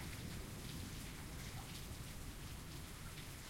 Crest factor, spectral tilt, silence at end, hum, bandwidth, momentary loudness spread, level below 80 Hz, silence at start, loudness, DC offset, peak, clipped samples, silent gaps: 14 dB; -4 dB/octave; 0 s; none; 16.5 kHz; 2 LU; -56 dBFS; 0 s; -50 LUFS; under 0.1%; -36 dBFS; under 0.1%; none